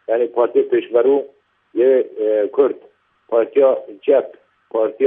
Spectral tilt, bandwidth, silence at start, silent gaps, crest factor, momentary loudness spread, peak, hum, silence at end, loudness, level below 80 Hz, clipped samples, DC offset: -9 dB/octave; 3.7 kHz; 0.1 s; none; 16 dB; 9 LU; -2 dBFS; none; 0 s; -17 LUFS; -78 dBFS; under 0.1%; under 0.1%